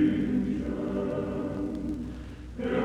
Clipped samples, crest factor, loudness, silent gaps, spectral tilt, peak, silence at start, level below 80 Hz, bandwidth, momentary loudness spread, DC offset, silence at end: under 0.1%; 14 dB; -31 LUFS; none; -8.5 dB/octave; -14 dBFS; 0 s; -44 dBFS; 9.8 kHz; 10 LU; under 0.1%; 0 s